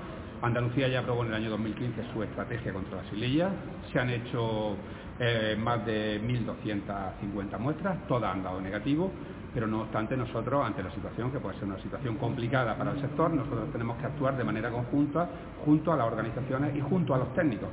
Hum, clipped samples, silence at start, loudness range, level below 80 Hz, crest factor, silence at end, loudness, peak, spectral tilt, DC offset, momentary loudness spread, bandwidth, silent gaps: none; under 0.1%; 0 s; 3 LU; -50 dBFS; 18 dB; 0 s; -31 LUFS; -12 dBFS; -6 dB/octave; under 0.1%; 7 LU; 4 kHz; none